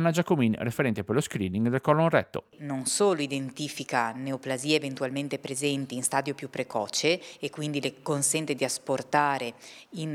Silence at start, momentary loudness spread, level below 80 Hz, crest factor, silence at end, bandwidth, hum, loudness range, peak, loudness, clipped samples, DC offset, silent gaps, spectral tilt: 0 s; 10 LU; -72 dBFS; 20 dB; 0 s; 17.5 kHz; none; 3 LU; -8 dBFS; -28 LUFS; under 0.1%; under 0.1%; none; -4 dB/octave